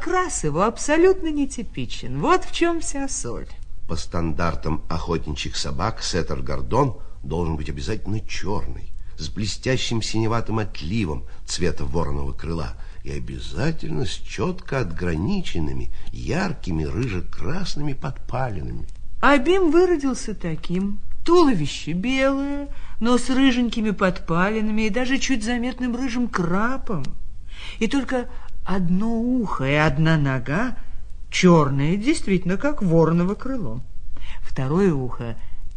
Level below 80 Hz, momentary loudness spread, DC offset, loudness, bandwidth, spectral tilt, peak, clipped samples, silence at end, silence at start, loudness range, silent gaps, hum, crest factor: -34 dBFS; 16 LU; under 0.1%; -23 LUFS; 10 kHz; -5.5 dB/octave; -2 dBFS; under 0.1%; 0 s; 0 s; 7 LU; none; none; 18 dB